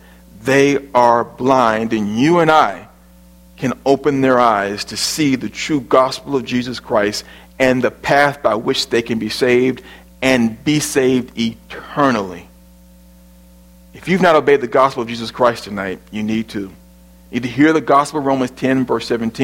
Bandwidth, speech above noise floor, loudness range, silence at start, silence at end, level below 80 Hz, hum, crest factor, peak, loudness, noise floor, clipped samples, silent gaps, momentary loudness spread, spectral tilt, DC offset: 16.5 kHz; 29 dB; 3 LU; 0.35 s; 0 s; -48 dBFS; none; 16 dB; 0 dBFS; -16 LUFS; -45 dBFS; under 0.1%; none; 11 LU; -5 dB/octave; under 0.1%